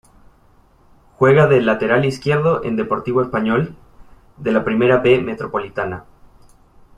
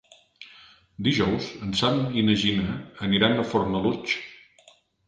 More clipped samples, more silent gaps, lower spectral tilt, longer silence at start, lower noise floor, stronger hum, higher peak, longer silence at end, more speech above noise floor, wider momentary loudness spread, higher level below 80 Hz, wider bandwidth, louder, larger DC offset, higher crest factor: neither; neither; first, -7.5 dB/octave vs -5.5 dB/octave; first, 1.2 s vs 0.4 s; second, -52 dBFS vs -58 dBFS; neither; first, -2 dBFS vs -6 dBFS; first, 1 s vs 0.7 s; about the same, 36 dB vs 34 dB; about the same, 12 LU vs 10 LU; about the same, -48 dBFS vs -50 dBFS; first, 10.5 kHz vs 9.2 kHz; first, -17 LUFS vs -24 LUFS; neither; about the same, 16 dB vs 20 dB